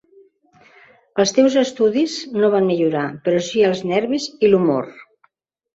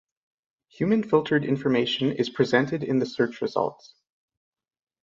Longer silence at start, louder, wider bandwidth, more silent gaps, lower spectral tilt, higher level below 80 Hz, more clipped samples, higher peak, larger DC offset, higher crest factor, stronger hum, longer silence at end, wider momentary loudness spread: first, 1.15 s vs 0.8 s; first, -18 LUFS vs -25 LUFS; about the same, 8 kHz vs 7.6 kHz; neither; second, -5 dB/octave vs -6.5 dB/octave; about the same, -62 dBFS vs -66 dBFS; neither; first, -2 dBFS vs -6 dBFS; neither; about the same, 16 dB vs 20 dB; neither; second, 0.7 s vs 1.3 s; about the same, 7 LU vs 5 LU